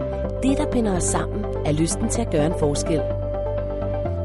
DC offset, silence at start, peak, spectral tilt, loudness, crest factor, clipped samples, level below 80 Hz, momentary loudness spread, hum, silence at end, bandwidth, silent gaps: under 0.1%; 0 s; -8 dBFS; -5.5 dB/octave; -23 LUFS; 14 dB; under 0.1%; -32 dBFS; 5 LU; none; 0 s; 11.5 kHz; none